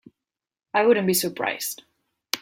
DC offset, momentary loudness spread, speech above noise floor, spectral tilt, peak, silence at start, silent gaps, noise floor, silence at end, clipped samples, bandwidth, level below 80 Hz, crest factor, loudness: under 0.1%; 12 LU; 67 dB; -3.5 dB/octave; 0 dBFS; 0.75 s; none; -89 dBFS; 0 s; under 0.1%; 16.5 kHz; -70 dBFS; 24 dB; -23 LUFS